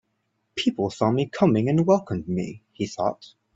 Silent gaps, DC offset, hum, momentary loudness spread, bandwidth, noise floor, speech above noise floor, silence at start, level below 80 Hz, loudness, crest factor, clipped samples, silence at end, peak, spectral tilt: none; under 0.1%; none; 12 LU; 8 kHz; -74 dBFS; 51 dB; 0.55 s; -60 dBFS; -24 LUFS; 18 dB; under 0.1%; 0.3 s; -6 dBFS; -7 dB/octave